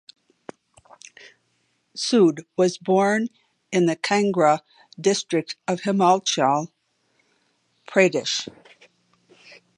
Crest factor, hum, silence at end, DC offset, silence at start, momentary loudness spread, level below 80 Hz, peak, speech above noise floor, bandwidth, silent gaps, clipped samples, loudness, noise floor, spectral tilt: 22 dB; none; 1.3 s; under 0.1%; 1.95 s; 9 LU; -74 dBFS; -2 dBFS; 48 dB; 11 kHz; none; under 0.1%; -21 LUFS; -69 dBFS; -4.5 dB/octave